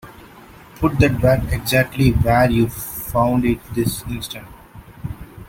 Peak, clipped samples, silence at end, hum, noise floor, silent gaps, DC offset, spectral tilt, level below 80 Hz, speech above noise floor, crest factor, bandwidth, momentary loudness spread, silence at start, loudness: -2 dBFS; under 0.1%; 0 s; none; -43 dBFS; none; under 0.1%; -6 dB/octave; -32 dBFS; 25 dB; 18 dB; 17 kHz; 17 LU; 0.05 s; -18 LUFS